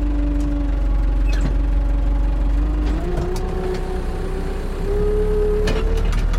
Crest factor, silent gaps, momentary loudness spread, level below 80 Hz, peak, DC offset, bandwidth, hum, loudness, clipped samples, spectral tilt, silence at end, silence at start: 10 dB; none; 6 LU; -20 dBFS; -8 dBFS; under 0.1%; 10.5 kHz; none; -22 LUFS; under 0.1%; -7.5 dB/octave; 0 s; 0 s